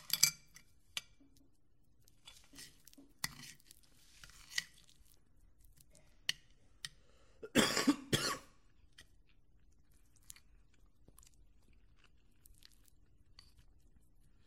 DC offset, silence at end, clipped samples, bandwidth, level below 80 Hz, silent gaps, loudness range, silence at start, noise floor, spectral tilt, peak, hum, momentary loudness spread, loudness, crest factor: under 0.1%; 5.45 s; under 0.1%; 16 kHz; -68 dBFS; none; 13 LU; 0.1 s; -73 dBFS; -2 dB/octave; -10 dBFS; none; 27 LU; -37 LUFS; 34 dB